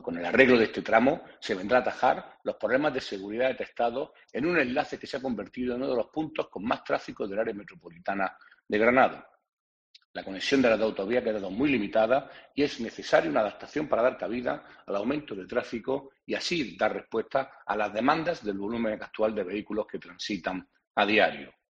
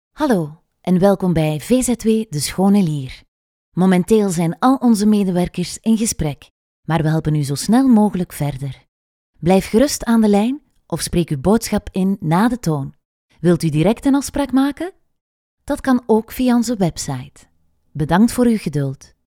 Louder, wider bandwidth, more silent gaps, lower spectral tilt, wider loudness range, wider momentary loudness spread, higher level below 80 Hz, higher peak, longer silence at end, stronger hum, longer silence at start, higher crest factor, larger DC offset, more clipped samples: second, -28 LUFS vs -17 LUFS; second, 9 kHz vs 17 kHz; second, 9.53-9.94 s, 10.05-10.14 s, 20.87-20.94 s vs 3.28-3.72 s, 6.50-6.83 s, 8.88-9.33 s, 13.05-13.29 s, 15.21-15.57 s; about the same, -5 dB/octave vs -6 dB/octave; about the same, 4 LU vs 3 LU; about the same, 11 LU vs 12 LU; second, -60 dBFS vs -42 dBFS; second, -4 dBFS vs 0 dBFS; about the same, 0.25 s vs 0.3 s; neither; second, 0 s vs 0.2 s; first, 24 dB vs 18 dB; neither; neither